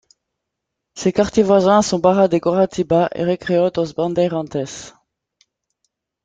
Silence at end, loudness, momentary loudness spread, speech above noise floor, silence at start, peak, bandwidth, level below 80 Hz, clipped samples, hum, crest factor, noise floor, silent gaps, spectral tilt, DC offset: 1.35 s; -17 LUFS; 10 LU; 63 dB; 0.95 s; -2 dBFS; 9.4 kHz; -52 dBFS; under 0.1%; none; 16 dB; -79 dBFS; none; -6 dB/octave; under 0.1%